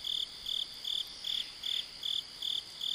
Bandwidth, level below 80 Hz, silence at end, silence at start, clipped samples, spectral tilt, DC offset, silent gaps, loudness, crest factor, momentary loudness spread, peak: 16 kHz; -68 dBFS; 0 s; 0 s; under 0.1%; 1 dB/octave; under 0.1%; none; -35 LUFS; 14 dB; 1 LU; -24 dBFS